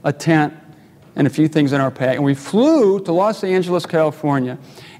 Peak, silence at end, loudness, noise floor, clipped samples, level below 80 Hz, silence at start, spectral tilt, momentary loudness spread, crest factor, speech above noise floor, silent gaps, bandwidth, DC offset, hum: -2 dBFS; 0.1 s; -17 LUFS; -45 dBFS; under 0.1%; -66 dBFS; 0.05 s; -7 dB/octave; 6 LU; 16 dB; 28 dB; none; 14.5 kHz; under 0.1%; none